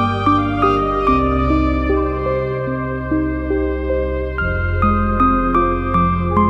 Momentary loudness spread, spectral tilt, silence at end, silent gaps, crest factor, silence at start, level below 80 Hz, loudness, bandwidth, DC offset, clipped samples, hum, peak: 5 LU; -9 dB/octave; 0 s; none; 14 dB; 0 s; -26 dBFS; -17 LUFS; 7.4 kHz; under 0.1%; under 0.1%; none; -2 dBFS